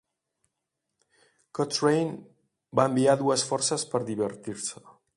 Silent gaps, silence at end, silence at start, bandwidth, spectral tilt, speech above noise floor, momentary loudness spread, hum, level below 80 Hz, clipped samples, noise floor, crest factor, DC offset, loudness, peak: none; 0.25 s; 1.55 s; 11.5 kHz; -4 dB/octave; 57 dB; 12 LU; none; -70 dBFS; under 0.1%; -83 dBFS; 22 dB; under 0.1%; -27 LUFS; -8 dBFS